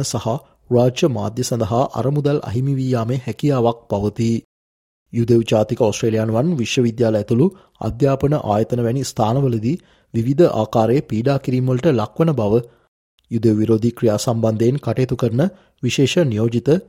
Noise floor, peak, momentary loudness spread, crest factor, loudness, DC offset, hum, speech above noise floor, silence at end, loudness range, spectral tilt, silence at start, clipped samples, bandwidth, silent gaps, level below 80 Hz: under -90 dBFS; -2 dBFS; 6 LU; 16 dB; -18 LUFS; under 0.1%; none; over 73 dB; 0.05 s; 2 LU; -7 dB/octave; 0 s; under 0.1%; 15.5 kHz; 4.44-5.06 s, 12.88-13.18 s; -48 dBFS